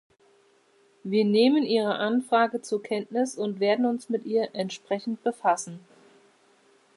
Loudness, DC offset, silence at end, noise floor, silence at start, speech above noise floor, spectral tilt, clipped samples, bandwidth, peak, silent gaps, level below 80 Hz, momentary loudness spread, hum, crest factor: -26 LUFS; under 0.1%; 1.2 s; -62 dBFS; 1.05 s; 37 dB; -5 dB/octave; under 0.1%; 11.5 kHz; -10 dBFS; none; -82 dBFS; 10 LU; none; 18 dB